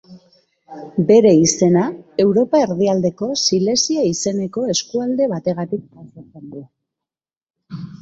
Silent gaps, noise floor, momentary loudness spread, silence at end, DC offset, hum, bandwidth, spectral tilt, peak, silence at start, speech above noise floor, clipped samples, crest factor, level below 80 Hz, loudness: 7.37-7.41 s, 7.50-7.54 s; -88 dBFS; 21 LU; 0.1 s; under 0.1%; none; 8 kHz; -5 dB/octave; -2 dBFS; 0.1 s; 71 dB; under 0.1%; 16 dB; -58 dBFS; -16 LUFS